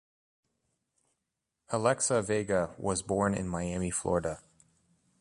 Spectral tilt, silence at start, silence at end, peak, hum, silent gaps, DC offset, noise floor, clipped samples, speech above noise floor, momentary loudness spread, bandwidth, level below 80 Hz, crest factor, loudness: -4.5 dB/octave; 1.7 s; 0.8 s; -12 dBFS; none; none; under 0.1%; -85 dBFS; under 0.1%; 55 dB; 7 LU; 11.5 kHz; -54 dBFS; 22 dB; -31 LUFS